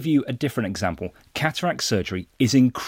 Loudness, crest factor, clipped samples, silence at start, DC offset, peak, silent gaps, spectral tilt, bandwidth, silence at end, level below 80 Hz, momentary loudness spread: -24 LUFS; 18 dB; under 0.1%; 0 s; under 0.1%; -4 dBFS; none; -5 dB/octave; 16.5 kHz; 0 s; -52 dBFS; 11 LU